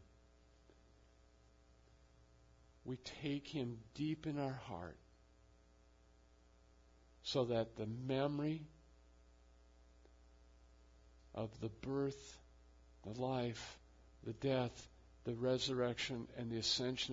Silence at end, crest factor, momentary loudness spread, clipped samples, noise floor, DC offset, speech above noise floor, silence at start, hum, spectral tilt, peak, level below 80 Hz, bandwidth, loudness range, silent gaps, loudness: 0 s; 22 dB; 17 LU; under 0.1%; -68 dBFS; under 0.1%; 27 dB; 0 s; none; -4.5 dB/octave; -24 dBFS; -66 dBFS; 7.4 kHz; 9 LU; none; -42 LUFS